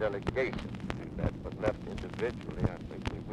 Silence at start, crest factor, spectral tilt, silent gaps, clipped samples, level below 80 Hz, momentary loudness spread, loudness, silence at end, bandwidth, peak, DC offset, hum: 0 s; 24 dB; -7.5 dB/octave; none; under 0.1%; -46 dBFS; 7 LU; -36 LUFS; 0 s; 11 kHz; -12 dBFS; under 0.1%; none